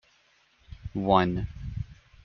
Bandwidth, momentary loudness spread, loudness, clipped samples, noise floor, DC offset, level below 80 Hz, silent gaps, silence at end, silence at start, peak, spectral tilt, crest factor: 6.6 kHz; 18 LU; -28 LUFS; under 0.1%; -65 dBFS; under 0.1%; -46 dBFS; none; 0.3 s; 0.7 s; -6 dBFS; -5.5 dB/octave; 24 dB